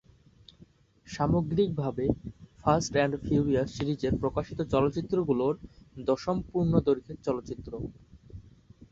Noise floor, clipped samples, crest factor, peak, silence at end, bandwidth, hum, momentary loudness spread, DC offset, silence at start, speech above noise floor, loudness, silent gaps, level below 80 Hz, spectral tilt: -59 dBFS; under 0.1%; 22 dB; -8 dBFS; 0.5 s; 7.8 kHz; none; 13 LU; under 0.1%; 0.6 s; 30 dB; -29 LUFS; none; -48 dBFS; -7 dB/octave